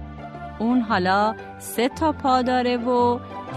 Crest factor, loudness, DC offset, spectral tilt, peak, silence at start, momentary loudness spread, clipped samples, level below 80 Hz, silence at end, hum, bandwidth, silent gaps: 14 dB; -22 LUFS; under 0.1%; -5.5 dB/octave; -8 dBFS; 0 s; 14 LU; under 0.1%; -48 dBFS; 0 s; none; 13 kHz; none